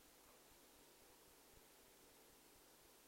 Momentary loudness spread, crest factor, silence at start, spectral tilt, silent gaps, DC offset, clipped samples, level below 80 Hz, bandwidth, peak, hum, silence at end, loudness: 0 LU; 16 dB; 0 s; -2 dB/octave; none; under 0.1%; under 0.1%; -82 dBFS; 16 kHz; -52 dBFS; none; 0 s; -67 LUFS